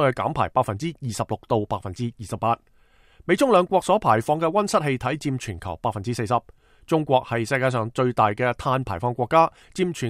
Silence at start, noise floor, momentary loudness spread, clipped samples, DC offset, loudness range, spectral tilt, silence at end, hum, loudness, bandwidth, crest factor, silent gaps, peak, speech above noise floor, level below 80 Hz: 0 s; -54 dBFS; 10 LU; under 0.1%; under 0.1%; 3 LU; -6 dB/octave; 0 s; none; -23 LUFS; 15.5 kHz; 18 dB; none; -4 dBFS; 31 dB; -50 dBFS